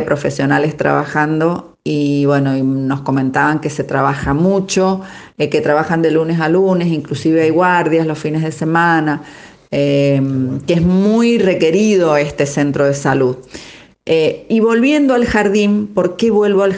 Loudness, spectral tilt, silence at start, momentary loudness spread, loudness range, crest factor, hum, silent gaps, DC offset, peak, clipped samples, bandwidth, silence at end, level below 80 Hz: -14 LUFS; -6.5 dB/octave; 0 s; 6 LU; 2 LU; 14 dB; none; none; under 0.1%; 0 dBFS; under 0.1%; 9.8 kHz; 0 s; -44 dBFS